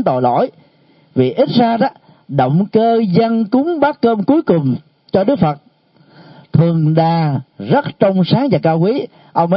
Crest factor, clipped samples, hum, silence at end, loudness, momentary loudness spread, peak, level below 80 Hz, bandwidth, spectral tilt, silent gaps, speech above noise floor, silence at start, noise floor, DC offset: 14 dB; under 0.1%; none; 0 s; -15 LUFS; 7 LU; 0 dBFS; -54 dBFS; 5.6 kHz; -12.5 dB/octave; none; 37 dB; 0 s; -51 dBFS; under 0.1%